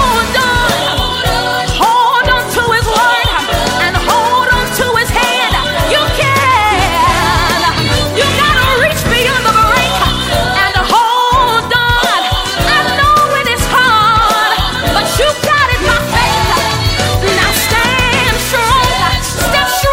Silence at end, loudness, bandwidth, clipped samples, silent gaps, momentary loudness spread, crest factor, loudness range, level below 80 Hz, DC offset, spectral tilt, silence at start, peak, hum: 0 s; -10 LUFS; 16.5 kHz; under 0.1%; none; 3 LU; 10 dB; 1 LU; -24 dBFS; under 0.1%; -3 dB/octave; 0 s; 0 dBFS; none